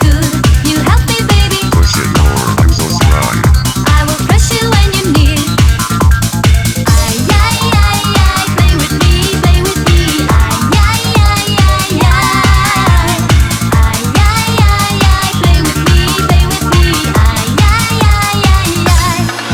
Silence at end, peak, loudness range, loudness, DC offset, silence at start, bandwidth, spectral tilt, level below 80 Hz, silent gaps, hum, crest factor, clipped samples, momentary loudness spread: 0 s; 0 dBFS; 1 LU; -10 LUFS; under 0.1%; 0 s; 18.5 kHz; -4.5 dB/octave; -14 dBFS; none; none; 8 dB; 0.1%; 1 LU